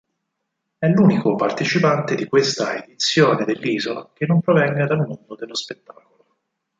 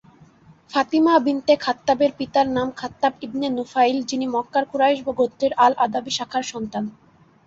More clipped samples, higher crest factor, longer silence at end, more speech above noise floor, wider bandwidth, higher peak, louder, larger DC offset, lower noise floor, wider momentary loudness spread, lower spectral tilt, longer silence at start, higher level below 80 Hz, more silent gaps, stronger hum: neither; about the same, 18 dB vs 18 dB; first, 1.05 s vs 0.55 s; first, 58 dB vs 30 dB; about the same, 7.8 kHz vs 8 kHz; about the same, -2 dBFS vs -4 dBFS; about the same, -19 LUFS vs -21 LUFS; neither; first, -77 dBFS vs -51 dBFS; first, 12 LU vs 9 LU; first, -5.5 dB/octave vs -4 dB/octave; about the same, 0.8 s vs 0.7 s; about the same, -62 dBFS vs -60 dBFS; neither; neither